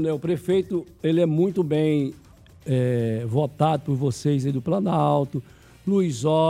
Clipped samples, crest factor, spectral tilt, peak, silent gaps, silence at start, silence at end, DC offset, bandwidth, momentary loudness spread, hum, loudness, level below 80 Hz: under 0.1%; 16 dB; -7.5 dB/octave; -6 dBFS; none; 0 s; 0 s; under 0.1%; 14 kHz; 6 LU; none; -23 LUFS; -56 dBFS